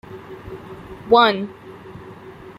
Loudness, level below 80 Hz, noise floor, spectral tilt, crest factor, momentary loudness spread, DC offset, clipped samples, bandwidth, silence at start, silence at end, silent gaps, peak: -16 LUFS; -52 dBFS; -39 dBFS; -6 dB/octave; 20 dB; 25 LU; under 0.1%; under 0.1%; 14.5 kHz; 0.1 s; 0.1 s; none; -2 dBFS